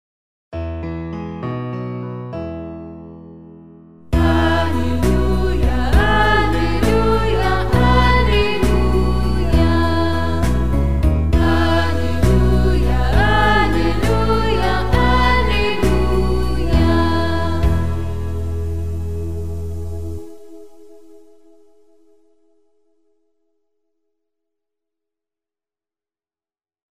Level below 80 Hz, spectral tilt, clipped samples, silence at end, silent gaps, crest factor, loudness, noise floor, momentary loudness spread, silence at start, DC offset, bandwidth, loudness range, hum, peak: -22 dBFS; -6.5 dB/octave; under 0.1%; 0.1 s; none; 16 dB; -18 LUFS; under -90 dBFS; 13 LU; 0.5 s; 5%; 15 kHz; 12 LU; none; -2 dBFS